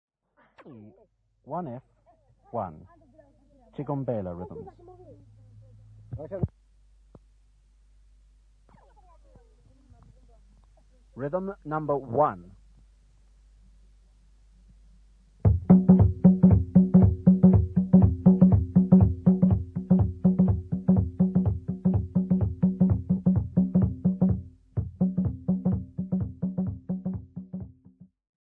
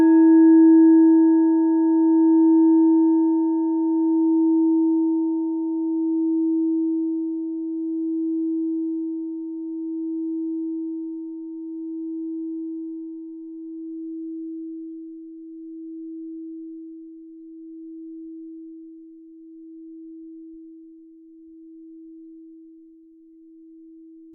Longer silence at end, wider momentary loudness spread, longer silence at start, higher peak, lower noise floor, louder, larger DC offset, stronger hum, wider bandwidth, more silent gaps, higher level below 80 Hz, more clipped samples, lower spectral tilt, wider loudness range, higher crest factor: second, 0.75 s vs 1.75 s; second, 19 LU vs 25 LU; first, 0.65 s vs 0 s; first, -4 dBFS vs -8 dBFS; first, -66 dBFS vs -50 dBFS; second, -24 LUFS vs -20 LUFS; neither; neither; first, 2.1 kHz vs 1.8 kHz; neither; first, -40 dBFS vs -80 dBFS; neither; first, -13.5 dB/octave vs -9 dB/octave; second, 21 LU vs 24 LU; first, 22 dB vs 14 dB